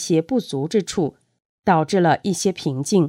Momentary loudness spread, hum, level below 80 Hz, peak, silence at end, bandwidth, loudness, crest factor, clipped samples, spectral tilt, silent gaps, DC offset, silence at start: 7 LU; none; -58 dBFS; -4 dBFS; 0 s; 15.5 kHz; -21 LUFS; 16 dB; under 0.1%; -5.5 dB/octave; 1.45-1.63 s; under 0.1%; 0 s